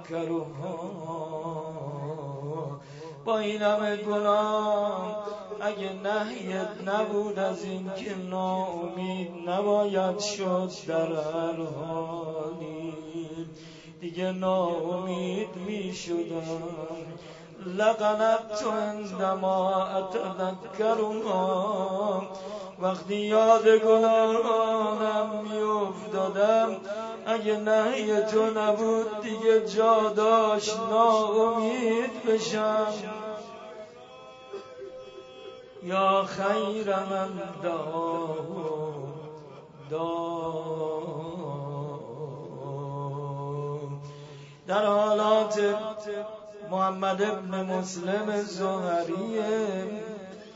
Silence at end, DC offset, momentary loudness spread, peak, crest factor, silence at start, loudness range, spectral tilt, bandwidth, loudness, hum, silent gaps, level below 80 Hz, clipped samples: 0 s; under 0.1%; 16 LU; -8 dBFS; 20 dB; 0 s; 10 LU; -5.5 dB/octave; 8 kHz; -28 LUFS; none; none; -70 dBFS; under 0.1%